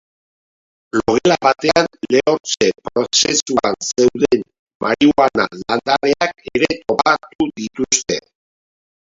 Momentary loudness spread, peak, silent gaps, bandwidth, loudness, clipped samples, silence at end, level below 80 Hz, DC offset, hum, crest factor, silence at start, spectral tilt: 8 LU; 0 dBFS; 2.40-2.44 s, 3.42-3.46 s, 4.59-4.66 s, 4.75-4.80 s, 7.35-7.39 s; 8 kHz; -16 LUFS; under 0.1%; 1 s; -50 dBFS; under 0.1%; none; 18 dB; 0.95 s; -3 dB/octave